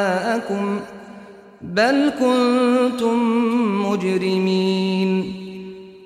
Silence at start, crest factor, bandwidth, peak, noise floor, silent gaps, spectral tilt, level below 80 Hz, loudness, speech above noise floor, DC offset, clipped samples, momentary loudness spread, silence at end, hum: 0 s; 14 dB; 13.5 kHz; -6 dBFS; -41 dBFS; none; -6 dB/octave; -60 dBFS; -19 LUFS; 23 dB; under 0.1%; under 0.1%; 18 LU; 0 s; none